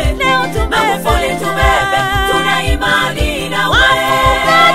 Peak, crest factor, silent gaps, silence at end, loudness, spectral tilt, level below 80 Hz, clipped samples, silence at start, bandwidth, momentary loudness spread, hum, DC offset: 0 dBFS; 12 dB; none; 0 s; -12 LUFS; -4 dB/octave; -22 dBFS; under 0.1%; 0 s; 16.5 kHz; 6 LU; none; under 0.1%